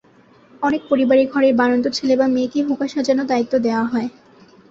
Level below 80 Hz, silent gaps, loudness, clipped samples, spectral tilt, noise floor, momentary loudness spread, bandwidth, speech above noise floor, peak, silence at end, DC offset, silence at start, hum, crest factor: -58 dBFS; none; -18 LUFS; under 0.1%; -5 dB/octave; -51 dBFS; 7 LU; 7.8 kHz; 34 dB; -4 dBFS; 0.6 s; under 0.1%; 0.6 s; none; 14 dB